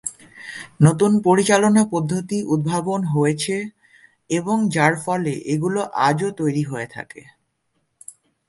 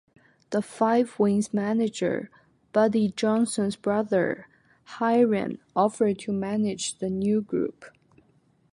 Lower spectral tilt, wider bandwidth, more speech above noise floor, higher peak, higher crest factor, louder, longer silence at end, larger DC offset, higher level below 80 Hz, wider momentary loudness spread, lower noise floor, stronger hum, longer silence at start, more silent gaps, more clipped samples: about the same, -5.5 dB/octave vs -5.5 dB/octave; about the same, 11.5 kHz vs 11.5 kHz; first, 51 dB vs 39 dB; first, 0 dBFS vs -8 dBFS; about the same, 20 dB vs 18 dB; first, -19 LUFS vs -25 LUFS; first, 1.3 s vs 0.85 s; neither; first, -58 dBFS vs -66 dBFS; first, 17 LU vs 8 LU; first, -70 dBFS vs -64 dBFS; neither; second, 0.05 s vs 0.5 s; neither; neither